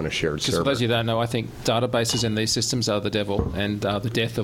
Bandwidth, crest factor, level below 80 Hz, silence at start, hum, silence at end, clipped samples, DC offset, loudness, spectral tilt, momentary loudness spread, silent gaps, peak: 16.5 kHz; 16 dB; -42 dBFS; 0 s; none; 0 s; under 0.1%; under 0.1%; -23 LUFS; -4.5 dB/octave; 3 LU; none; -8 dBFS